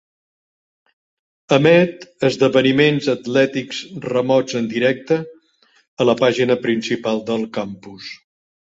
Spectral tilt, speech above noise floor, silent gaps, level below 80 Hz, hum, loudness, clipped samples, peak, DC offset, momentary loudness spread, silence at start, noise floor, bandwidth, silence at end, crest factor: -5.5 dB/octave; 40 dB; 5.88-5.97 s; -60 dBFS; none; -18 LUFS; under 0.1%; -2 dBFS; under 0.1%; 14 LU; 1.5 s; -58 dBFS; 8 kHz; 0.5 s; 18 dB